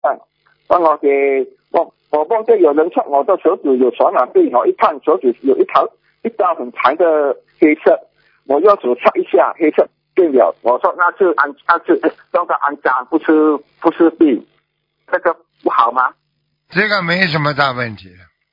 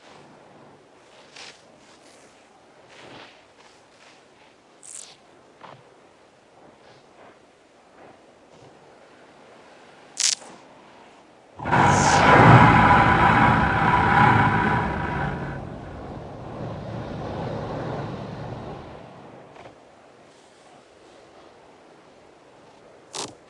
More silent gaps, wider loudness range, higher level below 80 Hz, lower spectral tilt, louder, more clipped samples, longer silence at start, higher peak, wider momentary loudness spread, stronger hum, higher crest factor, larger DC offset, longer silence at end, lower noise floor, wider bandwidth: neither; second, 2 LU vs 20 LU; second, -64 dBFS vs -44 dBFS; first, -8 dB/octave vs -5 dB/octave; first, -14 LUFS vs -19 LUFS; neither; second, 0.05 s vs 1.4 s; about the same, 0 dBFS vs -2 dBFS; second, 7 LU vs 28 LU; neither; second, 14 dB vs 24 dB; neither; first, 0.45 s vs 0.2 s; first, -66 dBFS vs -54 dBFS; second, 6 kHz vs 11.5 kHz